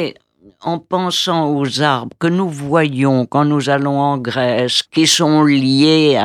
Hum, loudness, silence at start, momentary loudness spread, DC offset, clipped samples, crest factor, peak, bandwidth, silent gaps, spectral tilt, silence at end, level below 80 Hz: none; -15 LUFS; 0 s; 8 LU; under 0.1%; under 0.1%; 14 dB; 0 dBFS; 14.5 kHz; none; -4.5 dB/octave; 0 s; -62 dBFS